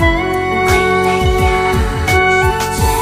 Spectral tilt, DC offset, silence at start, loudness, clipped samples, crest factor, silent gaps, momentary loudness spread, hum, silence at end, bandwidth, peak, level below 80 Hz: -5 dB/octave; under 0.1%; 0 s; -13 LUFS; under 0.1%; 12 dB; none; 4 LU; none; 0 s; 16 kHz; 0 dBFS; -22 dBFS